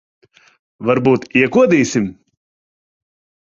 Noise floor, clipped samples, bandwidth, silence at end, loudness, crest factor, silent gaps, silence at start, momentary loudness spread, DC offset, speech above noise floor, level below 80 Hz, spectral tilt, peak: under -90 dBFS; under 0.1%; 7.6 kHz; 1.3 s; -15 LUFS; 16 dB; none; 0.8 s; 10 LU; under 0.1%; over 76 dB; -54 dBFS; -6 dB/octave; -2 dBFS